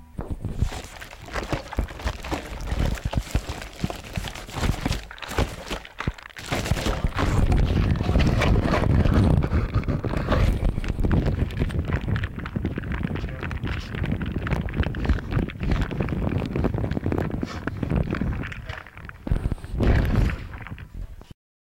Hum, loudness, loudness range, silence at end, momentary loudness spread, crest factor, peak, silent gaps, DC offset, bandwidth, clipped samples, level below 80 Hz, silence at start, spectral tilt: none; -26 LUFS; 8 LU; 0.3 s; 12 LU; 16 dB; -8 dBFS; none; under 0.1%; 16.5 kHz; under 0.1%; -28 dBFS; 0 s; -6.5 dB/octave